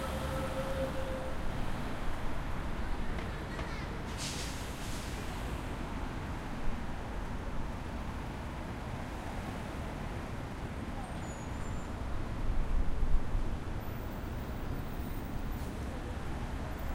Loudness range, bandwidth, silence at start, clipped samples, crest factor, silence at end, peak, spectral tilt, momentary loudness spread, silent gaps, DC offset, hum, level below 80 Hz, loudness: 2 LU; 16 kHz; 0 s; under 0.1%; 20 dB; 0 s; -14 dBFS; -5.5 dB/octave; 5 LU; none; under 0.1%; none; -38 dBFS; -40 LUFS